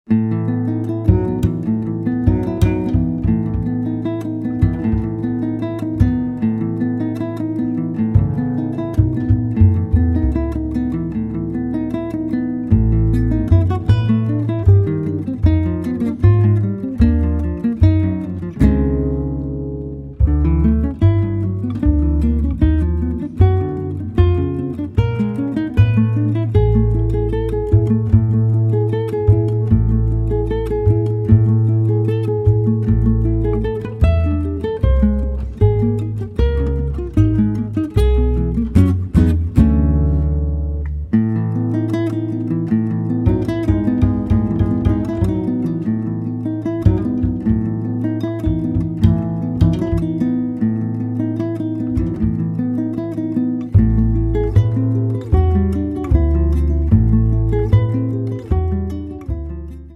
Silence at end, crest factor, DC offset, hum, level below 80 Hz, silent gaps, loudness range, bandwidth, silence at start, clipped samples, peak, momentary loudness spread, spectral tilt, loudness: 0 s; 16 dB; under 0.1%; none; -22 dBFS; none; 3 LU; 4.3 kHz; 0.1 s; under 0.1%; 0 dBFS; 7 LU; -10.5 dB/octave; -18 LUFS